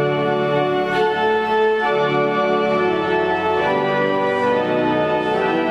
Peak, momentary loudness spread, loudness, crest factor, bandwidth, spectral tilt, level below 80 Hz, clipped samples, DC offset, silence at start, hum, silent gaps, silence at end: -6 dBFS; 1 LU; -18 LUFS; 12 dB; 9.6 kHz; -6.5 dB/octave; -54 dBFS; under 0.1%; under 0.1%; 0 s; none; none; 0 s